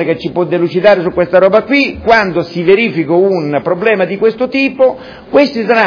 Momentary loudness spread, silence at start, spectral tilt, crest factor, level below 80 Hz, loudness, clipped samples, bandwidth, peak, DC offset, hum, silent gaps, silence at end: 5 LU; 0 s; -7 dB/octave; 10 dB; -44 dBFS; -11 LUFS; 0.4%; 5.4 kHz; 0 dBFS; under 0.1%; none; none; 0 s